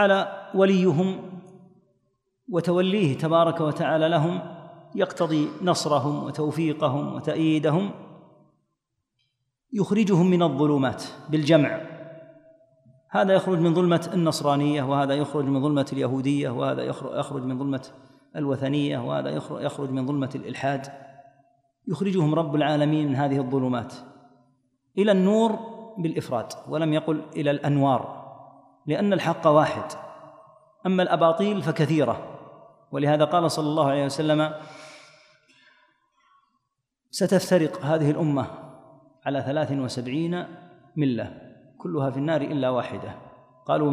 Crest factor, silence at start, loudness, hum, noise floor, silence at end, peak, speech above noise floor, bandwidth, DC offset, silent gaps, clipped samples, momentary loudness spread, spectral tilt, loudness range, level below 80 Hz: 20 dB; 0 s; -24 LUFS; none; -79 dBFS; 0 s; -6 dBFS; 56 dB; 14 kHz; under 0.1%; none; under 0.1%; 16 LU; -6.5 dB/octave; 5 LU; -70 dBFS